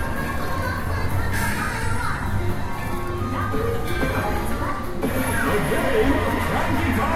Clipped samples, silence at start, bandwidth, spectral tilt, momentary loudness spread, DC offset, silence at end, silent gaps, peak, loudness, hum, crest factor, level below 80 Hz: under 0.1%; 0 s; 16 kHz; -5.5 dB/octave; 6 LU; under 0.1%; 0 s; none; -8 dBFS; -24 LUFS; none; 14 dB; -30 dBFS